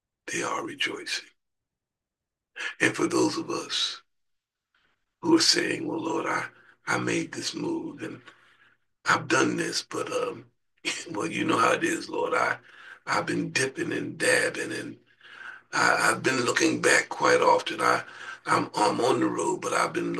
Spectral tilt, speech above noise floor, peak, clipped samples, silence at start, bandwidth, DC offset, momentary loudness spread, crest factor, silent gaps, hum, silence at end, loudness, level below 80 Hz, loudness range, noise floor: -3 dB/octave; 62 dB; -6 dBFS; under 0.1%; 0.25 s; 12.5 kHz; under 0.1%; 14 LU; 22 dB; none; none; 0 s; -26 LUFS; -74 dBFS; 6 LU; -88 dBFS